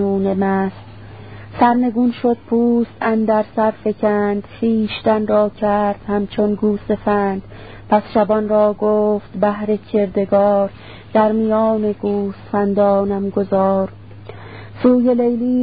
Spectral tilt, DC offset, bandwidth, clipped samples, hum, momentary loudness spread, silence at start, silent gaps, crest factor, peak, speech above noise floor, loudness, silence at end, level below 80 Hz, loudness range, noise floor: -12.5 dB/octave; 0.5%; 4.9 kHz; under 0.1%; none; 11 LU; 0 s; none; 16 dB; 0 dBFS; 19 dB; -17 LUFS; 0 s; -46 dBFS; 1 LU; -36 dBFS